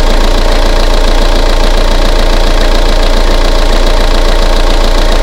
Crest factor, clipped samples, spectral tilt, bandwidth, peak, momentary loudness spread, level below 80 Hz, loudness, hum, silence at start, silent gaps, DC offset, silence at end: 6 dB; 2%; -4.5 dB/octave; 12.5 kHz; 0 dBFS; 0 LU; -6 dBFS; -11 LUFS; none; 0 s; none; under 0.1%; 0 s